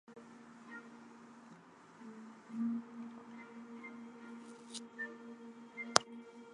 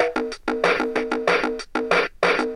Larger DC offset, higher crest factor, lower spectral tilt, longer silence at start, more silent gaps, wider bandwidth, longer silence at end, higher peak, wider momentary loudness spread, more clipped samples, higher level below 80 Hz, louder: neither; first, 42 dB vs 20 dB; second, -2 dB/octave vs -4 dB/octave; about the same, 0.05 s vs 0 s; neither; about the same, 11 kHz vs 12 kHz; about the same, 0 s vs 0 s; about the same, -2 dBFS vs -2 dBFS; first, 23 LU vs 6 LU; neither; second, -84 dBFS vs -50 dBFS; second, -42 LUFS vs -22 LUFS